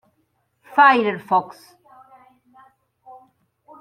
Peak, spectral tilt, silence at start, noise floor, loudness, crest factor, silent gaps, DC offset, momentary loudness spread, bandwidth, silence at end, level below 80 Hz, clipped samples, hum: -2 dBFS; -5.5 dB/octave; 0.7 s; -68 dBFS; -17 LUFS; 22 dB; none; under 0.1%; 10 LU; 13.5 kHz; 2.35 s; -76 dBFS; under 0.1%; none